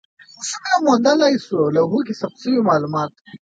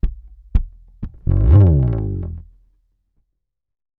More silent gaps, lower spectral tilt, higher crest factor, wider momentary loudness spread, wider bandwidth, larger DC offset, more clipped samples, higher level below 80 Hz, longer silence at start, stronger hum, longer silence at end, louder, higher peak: first, 3.21-3.25 s vs none; second, -5 dB/octave vs -12.5 dB/octave; about the same, 16 dB vs 18 dB; second, 11 LU vs 24 LU; first, 9.4 kHz vs 3 kHz; neither; neither; second, -64 dBFS vs -22 dBFS; first, 0.4 s vs 0.05 s; neither; second, 0.1 s vs 1.6 s; about the same, -18 LUFS vs -17 LUFS; about the same, -2 dBFS vs 0 dBFS